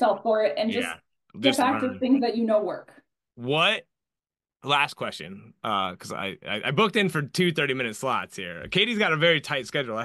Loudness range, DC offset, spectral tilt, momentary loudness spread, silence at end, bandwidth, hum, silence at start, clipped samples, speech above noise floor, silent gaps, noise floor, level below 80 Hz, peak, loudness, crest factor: 3 LU; under 0.1%; -4.5 dB/octave; 12 LU; 0 s; 12.5 kHz; none; 0 s; under 0.1%; over 65 dB; none; under -90 dBFS; -66 dBFS; -6 dBFS; -25 LUFS; 20 dB